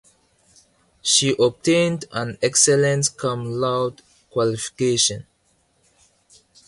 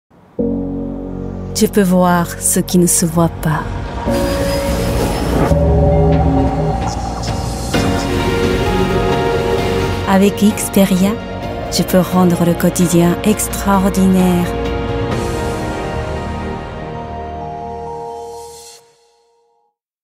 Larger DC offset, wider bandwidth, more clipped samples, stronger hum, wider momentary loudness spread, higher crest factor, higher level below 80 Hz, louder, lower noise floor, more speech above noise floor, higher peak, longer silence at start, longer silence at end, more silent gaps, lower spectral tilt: neither; second, 11.5 kHz vs 16.5 kHz; neither; neither; second, 11 LU vs 14 LU; first, 20 dB vs 14 dB; second, -58 dBFS vs -26 dBFS; second, -20 LUFS vs -15 LUFS; about the same, -64 dBFS vs -63 dBFS; second, 44 dB vs 51 dB; about the same, -2 dBFS vs 0 dBFS; first, 1.05 s vs 0.4 s; first, 1.45 s vs 1.3 s; neither; second, -3 dB/octave vs -5.5 dB/octave